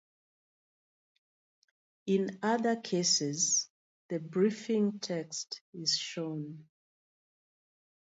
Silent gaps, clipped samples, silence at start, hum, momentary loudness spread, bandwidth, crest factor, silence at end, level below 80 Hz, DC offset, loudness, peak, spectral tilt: 3.70-4.09 s, 5.61-5.73 s; under 0.1%; 2.05 s; none; 13 LU; 8 kHz; 18 dB; 1.4 s; -84 dBFS; under 0.1%; -31 LUFS; -16 dBFS; -3 dB/octave